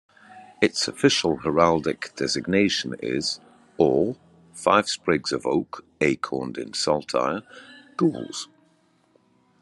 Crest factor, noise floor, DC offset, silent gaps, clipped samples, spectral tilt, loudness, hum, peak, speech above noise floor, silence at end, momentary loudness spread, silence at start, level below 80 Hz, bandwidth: 22 dB; -63 dBFS; under 0.1%; none; under 0.1%; -4 dB/octave; -24 LUFS; none; -2 dBFS; 39 dB; 1.15 s; 13 LU; 0.3 s; -60 dBFS; 12 kHz